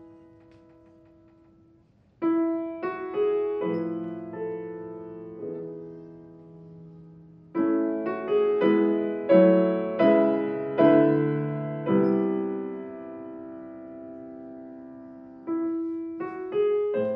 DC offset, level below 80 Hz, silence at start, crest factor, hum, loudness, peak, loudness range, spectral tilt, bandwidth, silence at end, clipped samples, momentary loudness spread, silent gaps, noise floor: under 0.1%; -70 dBFS; 0 s; 20 dB; none; -25 LUFS; -6 dBFS; 15 LU; -11 dB/octave; 5 kHz; 0 s; under 0.1%; 21 LU; none; -60 dBFS